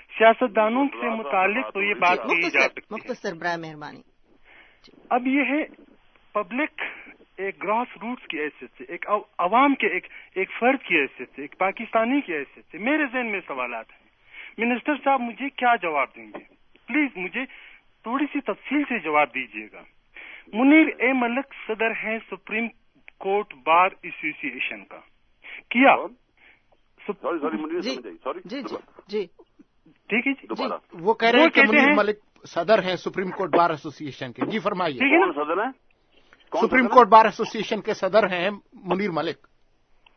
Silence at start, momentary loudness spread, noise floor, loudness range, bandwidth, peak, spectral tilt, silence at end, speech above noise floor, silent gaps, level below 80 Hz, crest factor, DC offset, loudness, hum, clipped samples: 0.1 s; 18 LU; -60 dBFS; 8 LU; 6.6 kHz; 0 dBFS; -5.5 dB/octave; 0.8 s; 37 dB; none; -64 dBFS; 24 dB; under 0.1%; -23 LUFS; none; under 0.1%